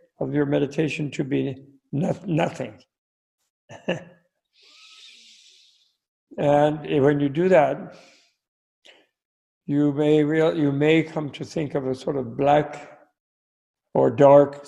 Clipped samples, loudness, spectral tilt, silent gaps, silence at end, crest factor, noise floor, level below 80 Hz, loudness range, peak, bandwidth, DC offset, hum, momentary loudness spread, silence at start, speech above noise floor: under 0.1%; -22 LUFS; -7.5 dB/octave; 2.98-3.38 s, 3.50-3.68 s, 6.08-6.27 s, 8.48-8.82 s, 9.25-9.61 s, 13.20-13.74 s; 0.05 s; 20 dB; -62 dBFS; -60 dBFS; 10 LU; -2 dBFS; 10.5 kHz; under 0.1%; none; 15 LU; 0.2 s; 41 dB